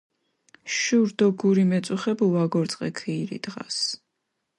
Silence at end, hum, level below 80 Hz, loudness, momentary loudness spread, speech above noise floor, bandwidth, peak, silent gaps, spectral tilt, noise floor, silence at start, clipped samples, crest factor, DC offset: 0.6 s; none; -70 dBFS; -24 LUFS; 11 LU; 55 dB; 11.5 kHz; -10 dBFS; none; -5 dB/octave; -79 dBFS; 0.65 s; under 0.1%; 16 dB; under 0.1%